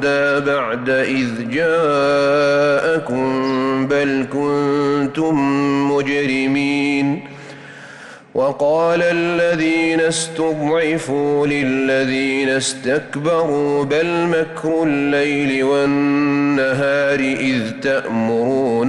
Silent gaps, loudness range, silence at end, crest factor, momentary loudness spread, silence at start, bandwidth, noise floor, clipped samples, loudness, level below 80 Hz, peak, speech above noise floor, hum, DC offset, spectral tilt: none; 2 LU; 0 s; 10 dB; 5 LU; 0 s; 11.5 kHz; -38 dBFS; under 0.1%; -17 LUFS; -54 dBFS; -8 dBFS; 21 dB; none; under 0.1%; -5 dB/octave